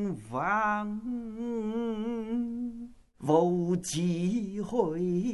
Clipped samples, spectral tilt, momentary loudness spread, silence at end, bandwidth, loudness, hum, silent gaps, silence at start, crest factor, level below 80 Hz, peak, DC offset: under 0.1%; -6 dB/octave; 10 LU; 0 s; 12 kHz; -31 LUFS; none; none; 0 s; 18 dB; -60 dBFS; -12 dBFS; under 0.1%